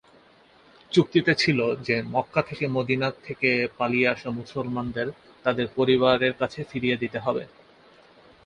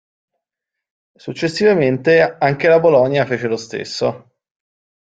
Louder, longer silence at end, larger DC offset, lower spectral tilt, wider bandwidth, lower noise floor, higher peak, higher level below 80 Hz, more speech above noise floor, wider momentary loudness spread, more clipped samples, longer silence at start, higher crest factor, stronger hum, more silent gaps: second, -25 LUFS vs -15 LUFS; about the same, 1 s vs 0.95 s; neither; about the same, -6 dB/octave vs -6 dB/octave; first, 10 kHz vs 9 kHz; second, -56 dBFS vs -83 dBFS; second, -6 dBFS vs -2 dBFS; about the same, -58 dBFS vs -58 dBFS; second, 31 dB vs 68 dB; about the same, 10 LU vs 11 LU; neither; second, 0.9 s vs 1.25 s; about the same, 20 dB vs 16 dB; neither; neither